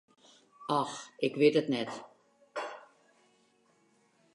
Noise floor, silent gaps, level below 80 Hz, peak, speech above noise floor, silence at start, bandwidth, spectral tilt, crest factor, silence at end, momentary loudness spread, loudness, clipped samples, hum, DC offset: -69 dBFS; none; -86 dBFS; -12 dBFS; 39 dB; 0.6 s; 11.5 kHz; -5 dB/octave; 22 dB; 1.5 s; 19 LU; -32 LUFS; under 0.1%; none; under 0.1%